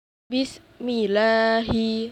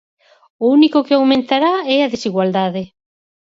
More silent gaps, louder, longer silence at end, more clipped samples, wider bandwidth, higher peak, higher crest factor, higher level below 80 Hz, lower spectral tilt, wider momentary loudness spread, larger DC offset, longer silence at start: neither; second, -23 LUFS vs -15 LUFS; second, 0 s vs 0.55 s; neither; first, 9.8 kHz vs 7.6 kHz; second, -10 dBFS vs -2 dBFS; about the same, 14 dB vs 14 dB; first, -48 dBFS vs -60 dBFS; about the same, -5.5 dB/octave vs -6 dB/octave; first, 11 LU vs 8 LU; neither; second, 0.3 s vs 0.6 s